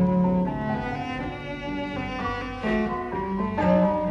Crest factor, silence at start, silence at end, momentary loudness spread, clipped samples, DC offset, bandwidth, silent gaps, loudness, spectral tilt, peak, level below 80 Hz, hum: 16 dB; 0 s; 0 s; 10 LU; under 0.1%; under 0.1%; 6.8 kHz; none; -26 LUFS; -8.5 dB/octave; -8 dBFS; -42 dBFS; none